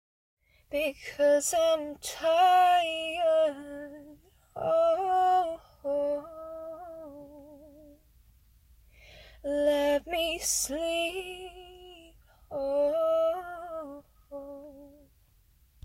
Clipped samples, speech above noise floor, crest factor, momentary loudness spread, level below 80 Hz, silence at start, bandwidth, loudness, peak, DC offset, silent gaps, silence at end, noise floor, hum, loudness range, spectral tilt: under 0.1%; 37 dB; 16 dB; 21 LU; -60 dBFS; 0.7 s; 16 kHz; -27 LUFS; -14 dBFS; under 0.1%; none; 0.95 s; -63 dBFS; none; 11 LU; -2 dB/octave